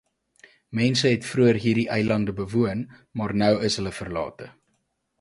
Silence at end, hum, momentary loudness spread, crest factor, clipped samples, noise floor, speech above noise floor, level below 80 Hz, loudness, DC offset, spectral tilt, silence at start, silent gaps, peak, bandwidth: 0.7 s; none; 13 LU; 18 dB; under 0.1%; -73 dBFS; 50 dB; -52 dBFS; -24 LUFS; under 0.1%; -5.5 dB/octave; 0.7 s; none; -6 dBFS; 11.5 kHz